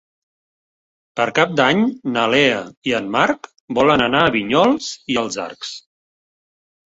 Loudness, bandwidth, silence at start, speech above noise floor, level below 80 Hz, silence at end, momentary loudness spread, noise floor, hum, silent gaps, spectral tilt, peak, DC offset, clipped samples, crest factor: -17 LUFS; 8 kHz; 1.15 s; over 73 dB; -54 dBFS; 1.05 s; 13 LU; under -90 dBFS; none; 2.77-2.82 s, 3.60-3.68 s; -4.5 dB/octave; 0 dBFS; under 0.1%; under 0.1%; 18 dB